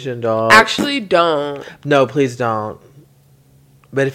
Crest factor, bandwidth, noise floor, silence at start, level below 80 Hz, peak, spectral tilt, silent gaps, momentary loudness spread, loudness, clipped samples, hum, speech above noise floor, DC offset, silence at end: 16 dB; 16.5 kHz; -50 dBFS; 0 s; -54 dBFS; 0 dBFS; -4.5 dB/octave; none; 16 LU; -15 LUFS; under 0.1%; none; 35 dB; under 0.1%; 0 s